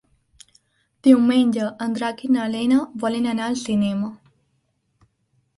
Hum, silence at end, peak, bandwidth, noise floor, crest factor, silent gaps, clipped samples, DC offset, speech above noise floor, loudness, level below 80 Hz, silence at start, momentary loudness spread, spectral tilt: none; 1.4 s; -2 dBFS; 11.5 kHz; -69 dBFS; 20 dB; none; under 0.1%; under 0.1%; 50 dB; -21 LUFS; -62 dBFS; 1.05 s; 10 LU; -5.5 dB/octave